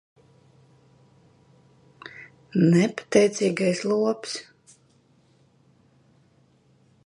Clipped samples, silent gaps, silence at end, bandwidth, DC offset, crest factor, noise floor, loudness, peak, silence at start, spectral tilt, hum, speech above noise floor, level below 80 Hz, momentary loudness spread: under 0.1%; none; 2.65 s; 11 kHz; under 0.1%; 22 dB; -61 dBFS; -23 LUFS; -4 dBFS; 2.05 s; -6 dB/octave; none; 39 dB; -70 dBFS; 23 LU